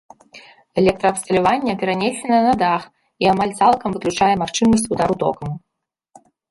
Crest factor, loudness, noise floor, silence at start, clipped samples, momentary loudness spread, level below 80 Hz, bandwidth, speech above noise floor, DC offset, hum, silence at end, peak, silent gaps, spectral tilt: 16 dB; -18 LUFS; -52 dBFS; 0.35 s; under 0.1%; 6 LU; -48 dBFS; 11.5 kHz; 34 dB; under 0.1%; none; 0.9 s; -2 dBFS; none; -5 dB/octave